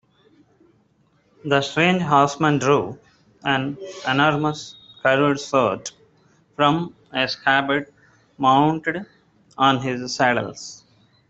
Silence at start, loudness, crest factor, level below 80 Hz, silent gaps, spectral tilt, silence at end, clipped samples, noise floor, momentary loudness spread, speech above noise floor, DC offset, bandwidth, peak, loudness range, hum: 1.45 s; -20 LUFS; 20 dB; -60 dBFS; none; -5 dB/octave; 0.55 s; under 0.1%; -61 dBFS; 15 LU; 42 dB; under 0.1%; 8 kHz; -2 dBFS; 2 LU; none